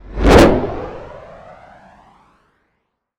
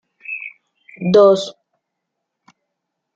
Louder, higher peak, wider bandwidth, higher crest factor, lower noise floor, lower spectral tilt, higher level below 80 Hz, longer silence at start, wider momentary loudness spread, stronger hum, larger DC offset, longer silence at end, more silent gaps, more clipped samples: first, -12 LUFS vs -15 LUFS; about the same, 0 dBFS vs -2 dBFS; first, 18 kHz vs 7.8 kHz; about the same, 16 dB vs 18 dB; second, -70 dBFS vs -78 dBFS; about the same, -6 dB/octave vs -6 dB/octave; first, -26 dBFS vs -68 dBFS; second, 0.1 s vs 0.3 s; first, 26 LU vs 19 LU; neither; neither; first, 2 s vs 1.65 s; neither; neither